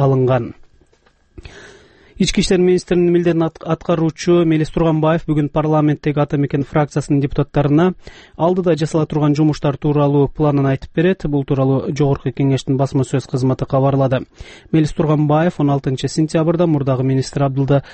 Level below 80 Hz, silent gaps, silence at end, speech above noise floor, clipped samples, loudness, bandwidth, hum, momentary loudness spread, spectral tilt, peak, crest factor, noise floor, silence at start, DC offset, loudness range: -38 dBFS; none; 0 s; 40 dB; under 0.1%; -16 LUFS; 8.8 kHz; none; 5 LU; -7.5 dB/octave; -4 dBFS; 12 dB; -55 dBFS; 0 s; under 0.1%; 2 LU